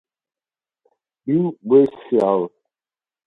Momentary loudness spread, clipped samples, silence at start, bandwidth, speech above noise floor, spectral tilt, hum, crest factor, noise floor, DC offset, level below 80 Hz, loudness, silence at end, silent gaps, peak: 11 LU; under 0.1%; 1.25 s; 4.6 kHz; over 73 dB; -10 dB/octave; none; 18 dB; under -90 dBFS; under 0.1%; -64 dBFS; -18 LUFS; 0.8 s; none; -2 dBFS